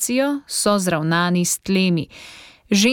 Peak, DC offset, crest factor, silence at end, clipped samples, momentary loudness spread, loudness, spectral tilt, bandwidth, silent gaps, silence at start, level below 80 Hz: -4 dBFS; under 0.1%; 14 dB; 0 s; under 0.1%; 12 LU; -19 LUFS; -4 dB/octave; 17.5 kHz; none; 0 s; -56 dBFS